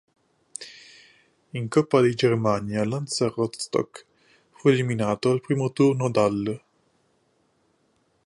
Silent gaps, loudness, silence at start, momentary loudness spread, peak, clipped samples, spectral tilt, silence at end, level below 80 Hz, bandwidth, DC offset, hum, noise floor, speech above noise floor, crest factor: none; -24 LUFS; 0.6 s; 17 LU; -6 dBFS; under 0.1%; -6 dB/octave; 1.7 s; -62 dBFS; 11.5 kHz; under 0.1%; none; -67 dBFS; 45 dB; 20 dB